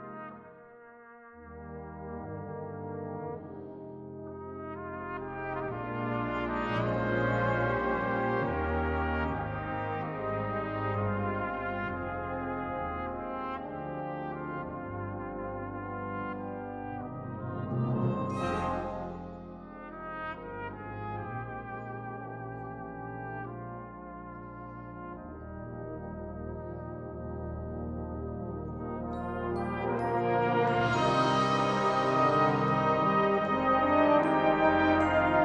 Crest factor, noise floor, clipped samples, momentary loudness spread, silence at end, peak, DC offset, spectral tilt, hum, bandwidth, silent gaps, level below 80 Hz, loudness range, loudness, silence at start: 20 dB; -52 dBFS; under 0.1%; 18 LU; 0 s; -12 dBFS; under 0.1%; -7 dB/octave; none; 9.6 kHz; none; -52 dBFS; 15 LU; -32 LUFS; 0 s